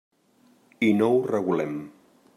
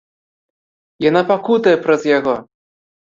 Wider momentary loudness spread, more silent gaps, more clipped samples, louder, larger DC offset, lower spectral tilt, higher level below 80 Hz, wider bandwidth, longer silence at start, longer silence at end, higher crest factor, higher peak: first, 14 LU vs 6 LU; neither; neither; second, -24 LUFS vs -15 LUFS; neither; about the same, -7 dB/octave vs -6 dB/octave; second, -72 dBFS vs -60 dBFS; first, 13 kHz vs 7.6 kHz; second, 0.8 s vs 1 s; second, 0.45 s vs 0.6 s; about the same, 16 dB vs 16 dB; second, -10 dBFS vs -2 dBFS